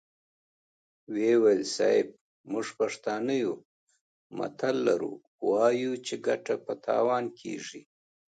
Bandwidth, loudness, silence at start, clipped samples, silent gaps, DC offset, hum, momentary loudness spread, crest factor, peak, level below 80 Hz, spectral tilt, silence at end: 9.2 kHz; -29 LUFS; 1.1 s; under 0.1%; 2.21-2.44 s, 3.65-3.87 s, 4.01-4.30 s, 5.27-5.39 s; under 0.1%; none; 13 LU; 18 dB; -10 dBFS; -80 dBFS; -4.5 dB/octave; 0.5 s